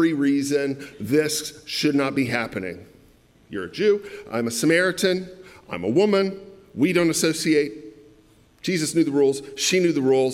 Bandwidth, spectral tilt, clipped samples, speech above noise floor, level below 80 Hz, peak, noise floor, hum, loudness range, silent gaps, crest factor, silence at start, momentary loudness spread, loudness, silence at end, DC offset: 16.5 kHz; -4.5 dB/octave; under 0.1%; 33 dB; -62 dBFS; -6 dBFS; -55 dBFS; none; 3 LU; none; 16 dB; 0 s; 13 LU; -22 LUFS; 0 s; under 0.1%